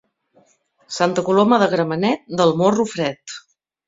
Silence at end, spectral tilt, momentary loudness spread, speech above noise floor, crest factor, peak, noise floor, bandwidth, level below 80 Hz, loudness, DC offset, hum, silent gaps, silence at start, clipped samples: 0.5 s; -5.5 dB/octave; 17 LU; 41 dB; 20 dB; 0 dBFS; -59 dBFS; 7.8 kHz; -60 dBFS; -18 LUFS; under 0.1%; none; none; 0.9 s; under 0.1%